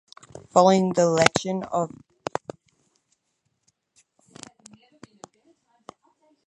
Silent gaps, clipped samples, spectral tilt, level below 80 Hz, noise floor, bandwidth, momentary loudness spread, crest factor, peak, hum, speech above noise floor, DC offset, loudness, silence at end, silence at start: none; under 0.1%; -4.5 dB/octave; -64 dBFS; -75 dBFS; 11.5 kHz; 27 LU; 26 dB; 0 dBFS; none; 55 dB; under 0.1%; -22 LUFS; 4.6 s; 0.55 s